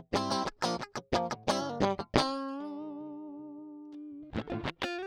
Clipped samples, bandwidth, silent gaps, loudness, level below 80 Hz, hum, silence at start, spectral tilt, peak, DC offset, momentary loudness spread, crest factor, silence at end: under 0.1%; 17.5 kHz; none; -34 LUFS; -56 dBFS; none; 0 s; -4.5 dB/octave; -6 dBFS; under 0.1%; 16 LU; 28 dB; 0 s